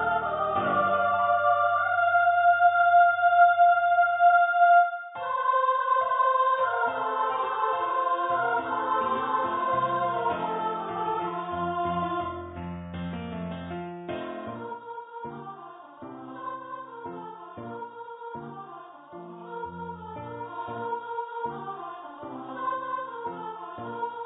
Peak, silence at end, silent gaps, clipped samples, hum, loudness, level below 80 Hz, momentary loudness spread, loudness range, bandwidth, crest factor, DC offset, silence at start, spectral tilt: -8 dBFS; 0 s; none; under 0.1%; none; -25 LUFS; -58 dBFS; 20 LU; 19 LU; 4 kHz; 18 dB; under 0.1%; 0 s; -9.5 dB/octave